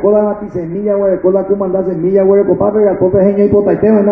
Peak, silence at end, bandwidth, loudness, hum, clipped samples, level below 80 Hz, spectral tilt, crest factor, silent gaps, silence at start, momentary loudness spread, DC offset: 0 dBFS; 0 s; 2.8 kHz; -12 LUFS; none; under 0.1%; -42 dBFS; -12.5 dB/octave; 10 dB; none; 0 s; 6 LU; under 0.1%